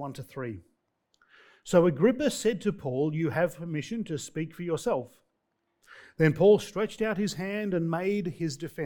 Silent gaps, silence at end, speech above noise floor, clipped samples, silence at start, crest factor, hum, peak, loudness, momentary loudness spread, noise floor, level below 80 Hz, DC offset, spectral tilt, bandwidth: none; 0 s; 51 dB; under 0.1%; 0 s; 20 dB; none; -8 dBFS; -28 LUFS; 16 LU; -78 dBFS; -62 dBFS; under 0.1%; -6 dB/octave; 18.5 kHz